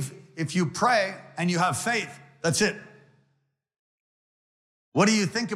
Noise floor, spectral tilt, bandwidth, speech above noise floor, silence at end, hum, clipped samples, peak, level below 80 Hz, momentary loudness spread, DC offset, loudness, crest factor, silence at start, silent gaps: -74 dBFS; -4 dB/octave; 15 kHz; 49 dB; 0 s; none; under 0.1%; -10 dBFS; -66 dBFS; 11 LU; under 0.1%; -25 LUFS; 18 dB; 0 s; 3.79-4.92 s